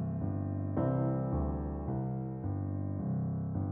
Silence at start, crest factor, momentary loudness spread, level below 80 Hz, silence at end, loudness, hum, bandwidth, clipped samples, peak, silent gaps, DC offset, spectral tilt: 0 s; 14 dB; 5 LU; -46 dBFS; 0 s; -35 LUFS; none; 2.4 kHz; under 0.1%; -20 dBFS; none; under 0.1%; -12.5 dB/octave